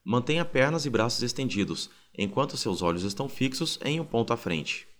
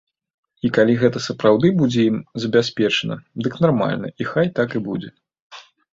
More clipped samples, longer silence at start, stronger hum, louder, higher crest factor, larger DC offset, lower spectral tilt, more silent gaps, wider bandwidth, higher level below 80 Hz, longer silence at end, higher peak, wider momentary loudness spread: neither; second, 0.05 s vs 0.65 s; neither; second, -28 LUFS vs -19 LUFS; about the same, 20 dB vs 18 dB; neither; second, -4.5 dB/octave vs -6.5 dB/octave; second, none vs 5.40-5.50 s; first, over 20 kHz vs 7.8 kHz; about the same, -56 dBFS vs -56 dBFS; second, 0.05 s vs 0.3 s; second, -8 dBFS vs -2 dBFS; second, 6 LU vs 10 LU